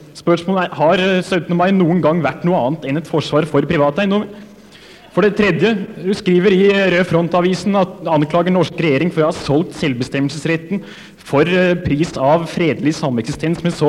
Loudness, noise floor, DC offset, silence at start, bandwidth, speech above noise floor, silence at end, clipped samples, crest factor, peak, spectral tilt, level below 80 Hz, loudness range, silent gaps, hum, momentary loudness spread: -16 LUFS; -41 dBFS; under 0.1%; 0 s; 12 kHz; 26 dB; 0 s; under 0.1%; 14 dB; -2 dBFS; -6.5 dB/octave; -46 dBFS; 3 LU; none; none; 7 LU